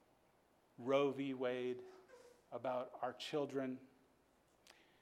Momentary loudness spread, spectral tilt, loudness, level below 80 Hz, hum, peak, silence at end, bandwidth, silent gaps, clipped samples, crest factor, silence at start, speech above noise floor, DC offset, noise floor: 16 LU; -5.5 dB/octave; -42 LUFS; -88 dBFS; none; -24 dBFS; 0.3 s; 14.5 kHz; none; under 0.1%; 20 dB; 0.8 s; 33 dB; under 0.1%; -74 dBFS